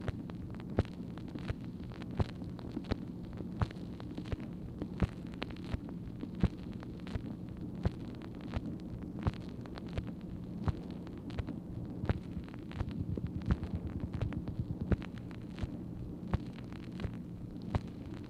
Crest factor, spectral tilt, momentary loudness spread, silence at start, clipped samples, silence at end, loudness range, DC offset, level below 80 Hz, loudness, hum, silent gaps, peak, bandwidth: 26 dB; -8.5 dB/octave; 8 LU; 0 s; under 0.1%; 0 s; 2 LU; under 0.1%; -46 dBFS; -41 LUFS; none; none; -14 dBFS; 11.5 kHz